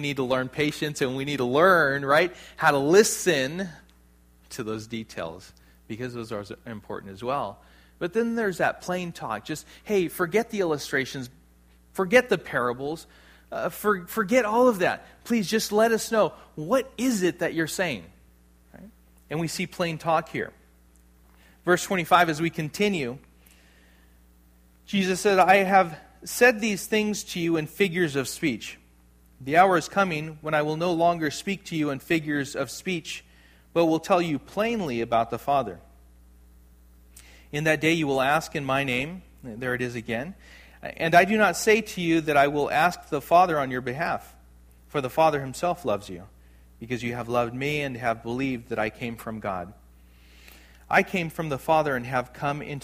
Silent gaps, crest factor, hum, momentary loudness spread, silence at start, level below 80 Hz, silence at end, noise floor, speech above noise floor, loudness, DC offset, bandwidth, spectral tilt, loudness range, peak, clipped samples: none; 22 dB; none; 15 LU; 0 s; -56 dBFS; 0.05 s; -57 dBFS; 32 dB; -25 LUFS; under 0.1%; 15.5 kHz; -4.5 dB/octave; 8 LU; -2 dBFS; under 0.1%